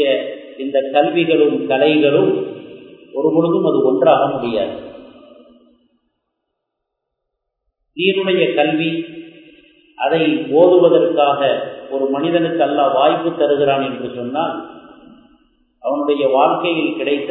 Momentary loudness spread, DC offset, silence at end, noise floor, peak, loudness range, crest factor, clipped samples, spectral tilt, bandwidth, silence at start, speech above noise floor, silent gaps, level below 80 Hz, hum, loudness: 12 LU; under 0.1%; 0 s; -77 dBFS; 0 dBFS; 6 LU; 16 dB; under 0.1%; -9.5 dB/octave; 4.2 kHz; 0 s; 62 dB; none; -64 dBFS; none; -16 LUFS